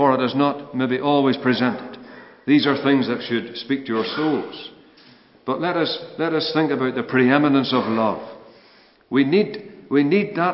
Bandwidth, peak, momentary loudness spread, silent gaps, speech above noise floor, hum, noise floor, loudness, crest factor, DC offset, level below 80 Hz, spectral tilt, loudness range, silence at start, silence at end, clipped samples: 5.8 kHz; 0 dBFS; 15 LU; none; 33 dB; none; -52 dBFS; -20 LUFS; 20 dB; under 0.1%; -68 dBFS; -10 dB/octave; 4 LU; 0 s; 0 s; under 0.1%